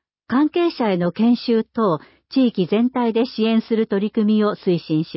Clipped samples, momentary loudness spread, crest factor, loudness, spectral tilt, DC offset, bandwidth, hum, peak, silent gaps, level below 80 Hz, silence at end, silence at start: under 0.1%; 3 LU; 12 dB; -19 LUFS; -11.5 dB/octave; under 0.1%; 5.8 kHz; none; -8 dBFS; none; -64 dBFS; 0 s; 0.3 s